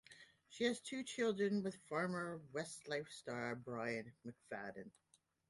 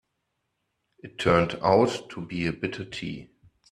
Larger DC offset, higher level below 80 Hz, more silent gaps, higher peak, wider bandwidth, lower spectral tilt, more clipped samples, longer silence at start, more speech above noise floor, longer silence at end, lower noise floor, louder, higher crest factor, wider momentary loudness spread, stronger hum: neither; second, -82 dBFS vs -54 dBFS; neither; second, -24 dBFS vs -6 dBFS; about the same, 11.5 kHz vs 12 kHz; second, -4.5 dB/octave vs -6 dB/octave; neither; second, 0.1 s vs 1.05 s; second, 21 dB vs 53 dB; first, 0.6 s vs 0.45 s; second, -65 dBFS vs -79 dBFS; second, -43 LUFS vs -26 LUFS; about the same, 20 dB vs 22 dB; about the same, 17 LU vs 15 LU; neither